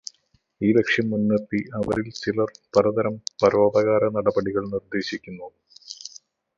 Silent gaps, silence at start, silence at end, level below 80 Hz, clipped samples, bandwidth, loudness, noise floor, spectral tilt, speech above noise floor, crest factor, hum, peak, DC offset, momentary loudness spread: none; 0.6 s; 0.5 s; -56 dBFS; under 0.1%; 7.6 kHz; -23 LUFS; -65 dBFS; -6 dB/octave; 43 dB; 20 dB; none; -4 dBFS; under 0.1%; 19 LU